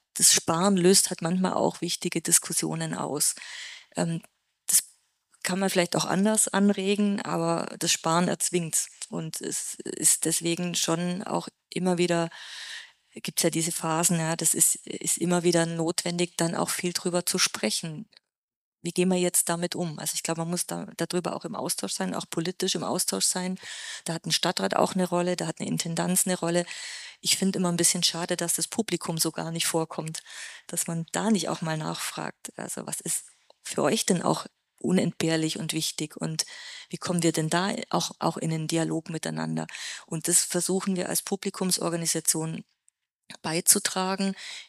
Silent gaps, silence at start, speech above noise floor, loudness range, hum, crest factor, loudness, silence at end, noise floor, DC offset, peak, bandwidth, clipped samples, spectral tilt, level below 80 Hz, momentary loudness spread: 18.37-18.48 s, 18.56-18.72 s; 0.15 s; 44 dB; 4 LU; none; 24 dB; -26 LUFS; 0.05 s; -71 dBFS; under 0.1%; -4 dBFS; 15.5 kHz; under 0.1%; -3 dB/octave; -74 dBFS; 13 LU